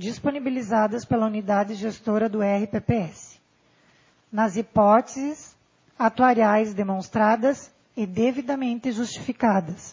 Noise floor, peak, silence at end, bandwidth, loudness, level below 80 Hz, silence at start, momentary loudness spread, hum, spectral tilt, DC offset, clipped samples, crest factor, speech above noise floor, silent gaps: -62 dBFS; -6 dBFS; 0 s; 7.6 kHz; -23 LUFS; -56 dBFS; 0 s; 12 LU; none; -6.5 dB/octave; under 0.1%; under 0.1%; 18 dB; 39 dB; none